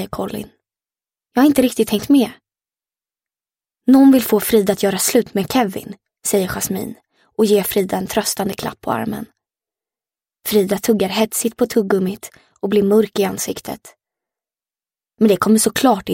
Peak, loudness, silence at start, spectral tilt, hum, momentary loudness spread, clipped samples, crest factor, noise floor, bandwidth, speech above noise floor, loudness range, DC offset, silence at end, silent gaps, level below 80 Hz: 0 dBFS; -17 LUFS; 0 s; -4.5 dB/octave; none; 15 LU; under 0.1%; 18 dB; under -90 dBFS; 17 kHz; over 74 dB; 5 LU; under 0.1%; 0 s; none; -52 dBFS